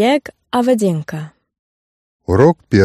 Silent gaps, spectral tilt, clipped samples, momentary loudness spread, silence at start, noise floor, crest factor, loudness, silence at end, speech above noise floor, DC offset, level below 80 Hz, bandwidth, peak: 1.59-2.19 s; -7 dB/octave; under 0.1%; 17 LU; 0 s; under -90 dBFS; 16 dB; -15 LUFS; 0 s; over 76 dB; under 0.1%; -44 dBFS; 14 kHz; 0 dBFS